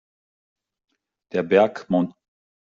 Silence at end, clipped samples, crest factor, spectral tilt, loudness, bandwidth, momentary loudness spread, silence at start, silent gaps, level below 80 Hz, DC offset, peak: 0.55 s; under 0.1%; 20 dB; -5.5 dB/octave; -22 LUFS; 7.2 kHz; 10 LU; 1.35 s; none; -68 dBFS; under 0.1%; -4 dBFS